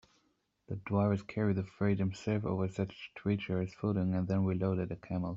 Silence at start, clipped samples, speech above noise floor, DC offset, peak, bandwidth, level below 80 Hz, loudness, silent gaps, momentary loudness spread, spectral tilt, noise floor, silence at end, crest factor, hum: 0.7 s; under 0.1%; 43 dB; under 0.1%; -16 dBFS; 7.6 kHz; -64 dBFS; -34 LUFS; none; 7 LU; -8.5 dB/octave; -76 dBFS; 0 s; 18 dB; none